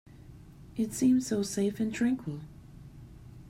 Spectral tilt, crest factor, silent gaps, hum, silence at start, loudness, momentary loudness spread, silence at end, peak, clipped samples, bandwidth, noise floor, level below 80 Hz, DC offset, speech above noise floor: -5.5 dB/octave; 16 dB; none; none; 0.15 s; -30 LUFS; 25 LU; 0 s; -16 dBFS; under 0.1%; 15.5 kHz; -51 dBFS; -56 dBFS; under 0.1%; 22 dB